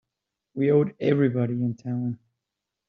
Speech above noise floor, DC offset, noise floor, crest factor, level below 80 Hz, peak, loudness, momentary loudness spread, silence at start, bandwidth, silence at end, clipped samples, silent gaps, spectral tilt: 62 dB; under 0.1%; -85 dBFS; 18 dB; -68 dBFS; -8 dBFS; -25 LUFS; 12 LU; 0.55 s; 6.6 kHz; 0.75 s; under 0.1%; none; -8.5 dB/octave